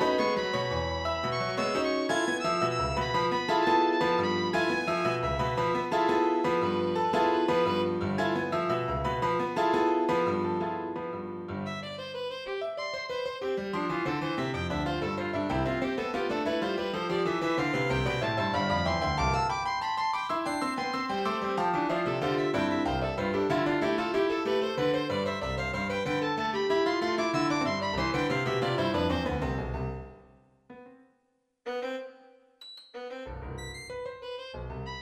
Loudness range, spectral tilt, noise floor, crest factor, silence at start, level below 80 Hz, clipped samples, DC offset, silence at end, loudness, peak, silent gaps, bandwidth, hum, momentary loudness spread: 7 LU; -5.5 dB/octave; -74 dBFS; 16 dB; 0 s; -48 dBFS; under 0.1%; under 0.1%; 0 s; -29 LUFS; -14 dBFS; none; 14 kHz; none; 11 LU